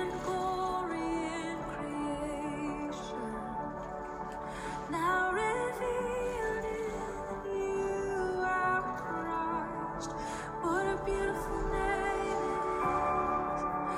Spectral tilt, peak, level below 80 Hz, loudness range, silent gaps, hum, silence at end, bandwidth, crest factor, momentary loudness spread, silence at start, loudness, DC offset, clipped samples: -5 dB/octave; -20 dBFS; -50 dBFS; 5 LU; none; none; 0 s; 16 kHz; 14 dB; 8 LU; 0 s; -34 LUFS; under 0.1%; under 0.1%